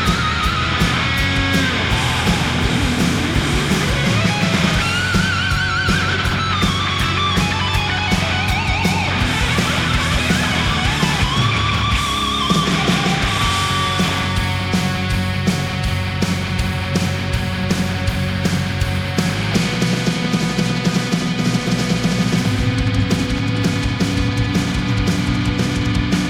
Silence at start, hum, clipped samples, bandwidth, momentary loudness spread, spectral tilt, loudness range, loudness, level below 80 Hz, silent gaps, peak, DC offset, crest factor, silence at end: 0 s; none; under 0.1%; 18 kHz; 3 LU; -4.5 dB/octave; 3 LU; -17 LUFS; -28 dBFS; none; -2 dBFS; under 0.1%; 16 dB; 0 s